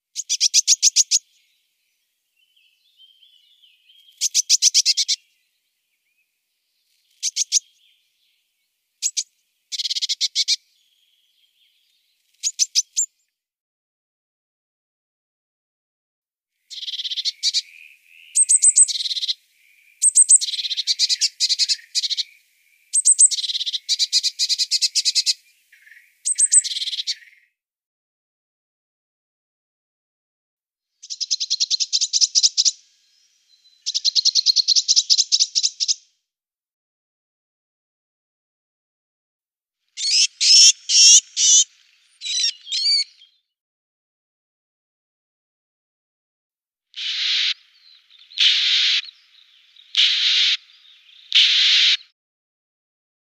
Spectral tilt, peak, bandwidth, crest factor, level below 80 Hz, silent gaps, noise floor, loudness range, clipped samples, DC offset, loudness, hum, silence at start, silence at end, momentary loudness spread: 12.5 dB/octave; -2 dBFS; 15.5 kHz; 20 dB; under -90 dBFS; 13.60-16.22 s, 27.86-30.57 s, 36.73-39.39 s, 43.60-46.50 s; -89 dBFS; 13 LU; under 0.1%; under 0.1%; -16 LUFS; none; 0.15 s; 1.3 s; 14 LU